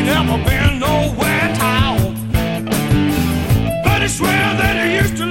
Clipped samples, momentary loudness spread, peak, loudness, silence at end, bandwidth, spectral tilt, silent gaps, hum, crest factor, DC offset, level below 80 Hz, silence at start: under 0.1%; 4 LU; -2 dBFS; -16 LUFS; 0 s; 16.5 kHz; -5 dB/octave; none; none; 14 dB; 0.6%; -26 dBFS; 0 s